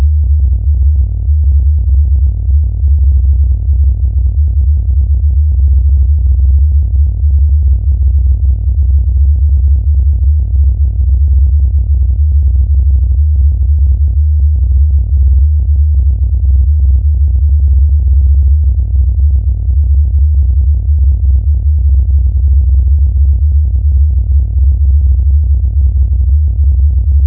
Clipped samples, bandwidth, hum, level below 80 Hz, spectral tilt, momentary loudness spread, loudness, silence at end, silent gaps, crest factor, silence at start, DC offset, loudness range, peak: under 0.1%; 0.7 kHz; none; -8 dBFS; -16.5 dB/octave; 2 LU; -11 LUFS; 0 s; none; 6 dB; 0 s; under 0.1%; 1 LU; -2 dBFS